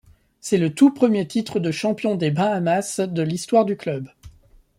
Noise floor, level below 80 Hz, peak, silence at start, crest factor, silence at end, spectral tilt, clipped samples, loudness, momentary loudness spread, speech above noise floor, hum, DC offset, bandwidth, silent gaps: -51 dBFS; -58 dBFS; -4 dBFS; 0.45 s; 18 dB; 0.5 s; -6 dB/octave; under 0.1%; -21 LUFS; 11 LU; 31 dB; none; under 0.1%; 15 kHz; none